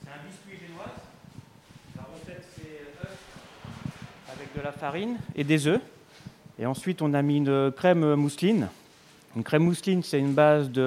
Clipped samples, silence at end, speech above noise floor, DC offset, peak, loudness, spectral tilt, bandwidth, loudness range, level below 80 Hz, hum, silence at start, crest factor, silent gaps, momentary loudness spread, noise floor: under 0.1%; 0 s; 30 dB; under 0.1%; -8 dBFS; -25 LUFS; -6.5 dB/octave; 15 kHz; 19 LU; -62 dBFS; none; 0 s; 20 dB; none; 23 LU; -55 dBFS